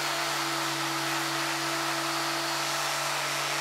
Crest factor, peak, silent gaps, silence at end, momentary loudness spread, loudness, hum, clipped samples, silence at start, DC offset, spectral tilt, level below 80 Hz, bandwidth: 14 dB; -16 dBFS; none; 0 s; 1 LU; -28 LUFS; none; under 0.1%; 0 s; under 0.1%; -1.5 dB/octave; -80 dBFS; 16 kHz